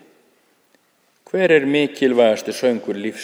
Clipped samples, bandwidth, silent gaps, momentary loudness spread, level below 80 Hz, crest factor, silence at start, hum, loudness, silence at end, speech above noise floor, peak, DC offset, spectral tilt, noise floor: under 0.1%; over 20 kHz; none; 9 LU; -74 dBFS; 18 dB; 1.35 s; none; -18 LUFS; 0 s; 44 dB; -2 dBFS; under 0.1%; -5 dB/octave; -62 dBFS